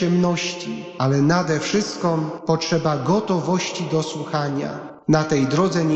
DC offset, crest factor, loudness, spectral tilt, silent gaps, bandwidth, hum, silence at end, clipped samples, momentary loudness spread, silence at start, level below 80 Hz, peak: under 0.1%; 16 dB; -21 LUFS; -5.5 dB/octave; none; 8.4 kHz; none; 0 s; under 0.1%; 7 LU; 0 s; -56 dBFS; -6 dBFS